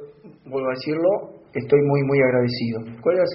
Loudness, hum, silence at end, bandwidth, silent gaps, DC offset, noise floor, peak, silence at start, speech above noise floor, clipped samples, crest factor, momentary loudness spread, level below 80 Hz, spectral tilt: -21 LUFS; none; 0 s; 5.8 kHz; none; under 0.1%; -43 dBFS; -4 dBFS; 0 s; 22 dB; under 0.1%; 16 dB; 11 LU; -60 dBFS; -6 dB/octave